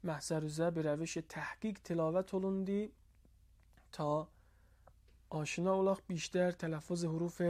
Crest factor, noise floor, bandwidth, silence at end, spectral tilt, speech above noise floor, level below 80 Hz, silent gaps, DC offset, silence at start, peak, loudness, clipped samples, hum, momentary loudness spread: 16 dB; -66 dBFS; 15 kHz; 0 s; -6 dB/octave; 29 dB; -66 dBFS; none; under 0.1%; 0.05 s; -22 dBFS; -38 LUFS; under 0.1%; none; 8 LU